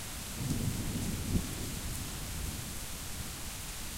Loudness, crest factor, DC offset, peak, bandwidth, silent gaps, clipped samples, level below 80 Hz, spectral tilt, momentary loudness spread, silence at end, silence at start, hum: -37 LUFS; 18 dB; under 0.1%; -18 dBFS; 16 kHz; none; under 0.1%; -44 dBFS; -4 dB/octave; 5 LU; 0 s; 0 s; none